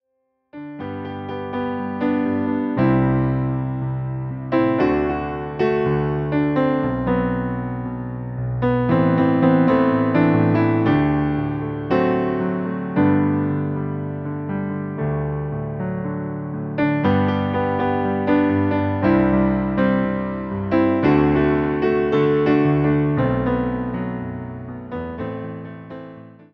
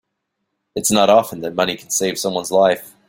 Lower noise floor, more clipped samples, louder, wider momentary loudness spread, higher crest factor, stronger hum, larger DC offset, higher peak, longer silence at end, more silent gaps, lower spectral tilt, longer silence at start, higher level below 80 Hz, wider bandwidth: second, -71 dBFS vs -75 dBFS; neither; second, -20 LUFS vs -17 LUFS; first, 12 LU vs 8 LU; about the same, 16 dB vs 18 dB; neither; neither; about the same, -4 dBFS vs -2 dBFS; about the same, 0.25 s vs 0.2 s; neither; first, -10.5 dB/octave vs -3 dB/octave; second, 0.55 s vs 0.75 s; first, -42 dBFS vs -58 dBFS; second, 5.8 kHz vs 17 kHz